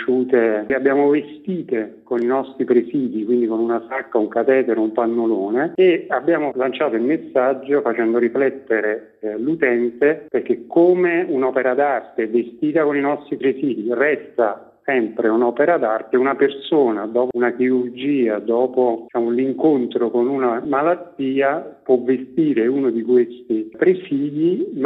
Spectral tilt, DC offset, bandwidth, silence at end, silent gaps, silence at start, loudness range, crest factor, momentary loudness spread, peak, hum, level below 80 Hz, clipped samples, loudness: -9.5 dB/octave; under 0.1%; 4 kHz; 0 s; none; 0 s; 1 LU; 16 dB; 6 LU; -4 dBFS; none; -68 dBFS; under 0.1%; -19 LUFS